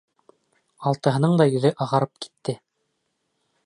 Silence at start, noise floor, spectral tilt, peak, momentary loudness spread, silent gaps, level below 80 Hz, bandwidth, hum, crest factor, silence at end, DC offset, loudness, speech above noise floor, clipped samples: 0.8 s; -75 dBFS; -7 dB/octave; -4 dBFS; 13 LU; none; -68 dBFS; 11 kHz; none; 20 dB; 1.1 s; under 0.1%; -22 LUFS; 53 dB; under 0.1%